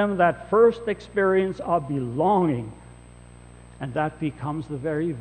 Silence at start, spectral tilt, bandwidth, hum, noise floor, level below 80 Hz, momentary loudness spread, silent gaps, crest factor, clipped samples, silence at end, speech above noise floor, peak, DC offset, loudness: 0 s; -8 dB/octave; 8.6 kHz; 60 Hz at -45 dBFS; -46 dBFS; -50 dBFS; 12 LU; none; 18 dB; under 0.1%; 0 s; 23 dB; -6 dBFS; under 0.1%; -24 LUFS